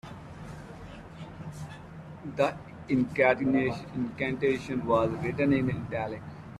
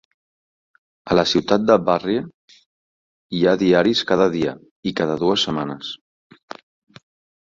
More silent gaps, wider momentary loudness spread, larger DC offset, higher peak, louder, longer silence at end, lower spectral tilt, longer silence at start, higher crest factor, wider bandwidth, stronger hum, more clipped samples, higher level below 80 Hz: second, none vs 2.34-2.48 s, 2.66-3.29 s, 4.71-4.83 s; about the same, 20 LU vs 21 LU; neither; second, -10 dBFS vs -2 dBFS; second, -28 LUFS vs -19 LUFS; second, 0 s vs 1.45 s; first, -7.5 dB/octave vs -5.5 dB/octave; second, 0.05 s vs 1.05 s; about the same, 20 dB vs 20 dB; first, 11.5 kHz vs 7.6 kHz; neither; neither; about the same, -56 dBFS vs -54 dBFS